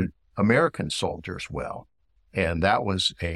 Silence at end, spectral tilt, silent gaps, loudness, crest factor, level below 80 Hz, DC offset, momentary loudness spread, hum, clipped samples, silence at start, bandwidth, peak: 0 s; -5 dB/octave; none; -25 LUFS; 18 dB; -46 dBFS; under 0.1%; 13 LU; none; under 0.1%; 0 s; 12.5 kHz; -8 dBFS